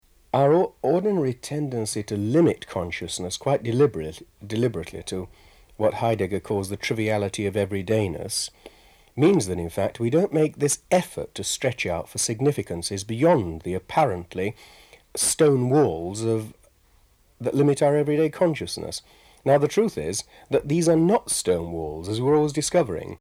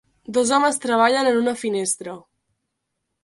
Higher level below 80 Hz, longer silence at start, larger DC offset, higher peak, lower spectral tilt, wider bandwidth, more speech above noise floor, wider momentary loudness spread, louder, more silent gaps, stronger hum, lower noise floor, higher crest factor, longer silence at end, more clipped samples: first, -52 dBFS vs -66 dBFS; about the same, 0.35 s vs 0.3 s; neither; second, -8 dBFS vs -4 dBFS; first, -5 dB/octave vs -2.5 dB/octave; first, 16 kHz vs 11.5 kHz; second, 36 dB vs 58 dB; about the same, 11 LU vs 10 LU; second, -24 LUFS vs -20 LUFS; neither; neither; second, -59 dBFS vs -78 dBFS; about the same, 16 dB vs 18 dB; second, 0.05 s vs 1.05 s; neither